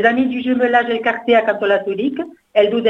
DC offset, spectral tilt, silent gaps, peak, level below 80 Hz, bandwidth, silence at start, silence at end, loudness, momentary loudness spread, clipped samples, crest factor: under 0.1%; -6.5 dB/octave; none; 0 dBFS; -60 dBFS; 6.6 kHz; 0 s; 0 s; -17 LUFS; 6 LU; under 0.1%; 16 dB